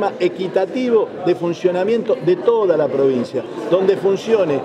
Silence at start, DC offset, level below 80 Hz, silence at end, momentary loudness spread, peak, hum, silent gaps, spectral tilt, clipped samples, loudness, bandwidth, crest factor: 0 s; under 0.1%; -66 dBFS; 0 s; 4 LU; -4 dBFS; none; none; -7 dB/octave; under 0.1%; -18 LUFS; 9.2 kHz; 14 dB